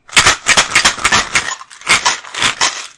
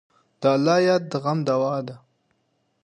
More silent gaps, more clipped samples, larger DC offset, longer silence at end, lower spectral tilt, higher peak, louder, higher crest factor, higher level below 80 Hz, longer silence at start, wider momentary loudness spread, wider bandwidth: neither; first, 0.3% vs under 0.1%; neither; second, 0.1 s vs 0.85 s; second, 0 dB/octave vs -6.5 dB/octave; first, 0 dBFS vs -6 dBFS; first, -11 LUFS vs -22 LUFS; about the same, 14 dB vs 16 dB; first, -40 dBFS vs -72 dBFS; second, 0.1 s vs 0.4 s; about the same, 7 LU vs 9 LU; first, 12 kHz vs 9.8 kHz